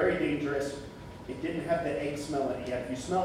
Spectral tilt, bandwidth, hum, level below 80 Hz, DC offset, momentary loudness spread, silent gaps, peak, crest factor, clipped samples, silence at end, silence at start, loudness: -5.5 dB/octave; 15 kHz; none; -54 dBFS; under 0.1%; 12 LU; none; -14 dBFS; 16 dB; under 0.1%; 0 s; 0 s; -33 LUFS